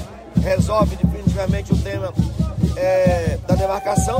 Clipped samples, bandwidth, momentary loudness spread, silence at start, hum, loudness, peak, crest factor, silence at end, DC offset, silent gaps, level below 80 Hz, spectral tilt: under 0.1%; 16 kHz; 5 LU; 0 s; none; -19 LUFS; -4 dBFS; 14 dB; 0 s; under 0.1%; none; -28 dBFS; -7 dB/octave